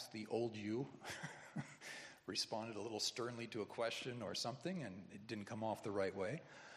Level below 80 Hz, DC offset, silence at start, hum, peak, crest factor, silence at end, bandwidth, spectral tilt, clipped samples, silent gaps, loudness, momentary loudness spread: -86 dBFS; under 0.1%; 0 s; none; -26 dBFS; 20 dB; 0 s; 14 kHz; -4 dB/octave; under 0.1%; none; -45 LUFS; 9 LU